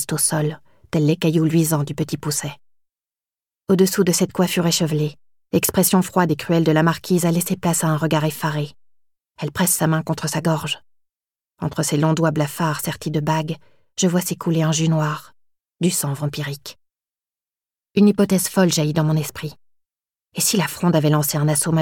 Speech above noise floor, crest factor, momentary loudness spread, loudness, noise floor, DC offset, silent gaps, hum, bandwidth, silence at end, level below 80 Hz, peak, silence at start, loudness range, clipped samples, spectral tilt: over 71 dB; 16 dB; 12 LU; -20 LUFS; under -90 dBFS; 0.2%; none; none; 18 kHz; 0 s; -56 dBFS; -4 dBFS; 0 s; 4 LU; under 0.1%; -5 dB/octave